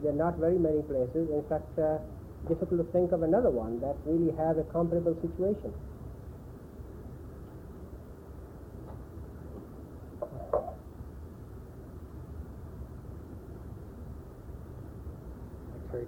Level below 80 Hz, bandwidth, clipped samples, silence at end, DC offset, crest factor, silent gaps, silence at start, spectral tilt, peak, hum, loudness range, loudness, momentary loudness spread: -48 dBFS; 16.5 kHz; under 0.1%; 0 s; under 0.1%; 20 dB; none; 0 s; -10.5 dB/octave; -14 dBFS; none; 17 LU; -31 LUFS; 19 LU